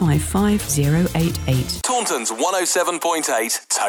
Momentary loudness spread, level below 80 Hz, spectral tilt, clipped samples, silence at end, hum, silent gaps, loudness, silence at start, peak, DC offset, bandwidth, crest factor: 3 LU; -36 dBFS; -4 dB/octave; under 0.1%; 0 s; none; none; -19 LUFS; 0 s; -6 dBFS; under 0.1%; over 20 kHz; 12 dB